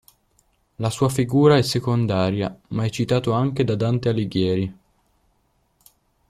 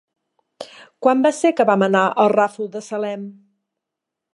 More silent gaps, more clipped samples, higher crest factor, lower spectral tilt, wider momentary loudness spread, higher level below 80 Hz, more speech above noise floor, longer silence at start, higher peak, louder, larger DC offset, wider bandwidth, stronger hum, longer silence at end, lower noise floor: neither; neither; about the same, 20 dB vs 18 dB; about the same, -6.5 dB/octave vs -5.5 dB/octave; second, 11 LU vs 22 LU; first, -52 dBFS vs -78 dBFS; second, 46 dB vs 66 dB; first, 0.8 s vs 0.6 s; about the same, -2 dBFS vs -2 dBFS; second, -21 LUFS vs -18 LUFS; neither; first, 14.5 kHz vs 11.5 kHz; neither; first, 1.55 s vs 1.05 s; second, -66 dBFS vs -83 dBFS